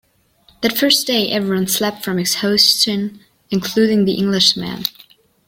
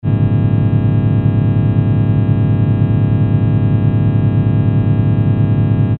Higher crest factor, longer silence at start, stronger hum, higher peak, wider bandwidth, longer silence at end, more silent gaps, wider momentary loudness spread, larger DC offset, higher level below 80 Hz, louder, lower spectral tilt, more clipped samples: first, 18 dB vs 12 dB; first, 0.6 s vs 0.05 s; neither; about the same, 0 dBFS vs 0 dBFS; first, 16.5 kHz vs 3.9 kHz; first, 0.55 s vs 0 s; neither; first, 12 LU vs 0 LU; second, under 0.1% vs 0.4%; second, -56 dBFS vs -32 dBFS; second, -16 LUFS vs -13 LUFS; second, -3.5 dB/octave vs -10.5 dB/octave; neither